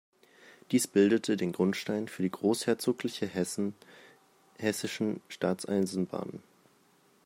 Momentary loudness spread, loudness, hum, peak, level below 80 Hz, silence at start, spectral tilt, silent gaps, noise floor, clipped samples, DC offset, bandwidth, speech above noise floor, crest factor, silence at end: 9 LU; -31 LUFS; none; -12 dBFS; -76 dBFS; 0.45 s; -5 dB/octave; none; -65 dBFS; under 0.1%; under 0.1%; 16 kHz; 35 dB; 20 dB; 0.85 s